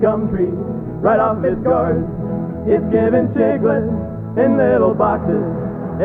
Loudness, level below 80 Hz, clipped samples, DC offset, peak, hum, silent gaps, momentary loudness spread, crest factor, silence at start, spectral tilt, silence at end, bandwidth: -17 LUFS; -38 dBFS; under 0.1%; under 0.1%; -2 dBFS; none; none; 9 LU; 14 dB; 0 s; -11.5 dB/octave; 0 s; 3.8 kHz